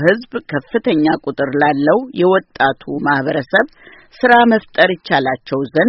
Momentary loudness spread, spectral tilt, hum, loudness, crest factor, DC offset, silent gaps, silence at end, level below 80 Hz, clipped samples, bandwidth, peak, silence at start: 9 LU; -3.5 dB/octave; none; -15 LUFS; 14 dB; under 0.1%; none; 0 s; -54 dBFS; under 0.1%; 6 kHz; 0 dBFS; 0 s